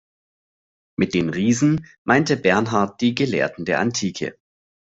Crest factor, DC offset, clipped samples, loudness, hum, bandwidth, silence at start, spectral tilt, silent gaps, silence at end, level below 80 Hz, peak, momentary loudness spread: 20 dB; under 0.1%; under 0.1%; -20 LUFS; none; 8 kHz; 1 s; -5 dB/octave; 1.98-2.05 s; 0.6 s; -56 dBFS; -2 dBFS; 8 LU